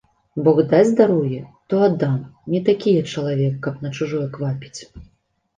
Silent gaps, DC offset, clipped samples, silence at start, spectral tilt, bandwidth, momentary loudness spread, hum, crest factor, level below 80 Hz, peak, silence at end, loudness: none; under 0.1%; under 0.1%; 0.35 s; -7.5 dB/octave; 9.4 kHz; 13 LU; none; 18 dB; -54 dBFS; -2 dBFS; 0.55 s; -19 LUFS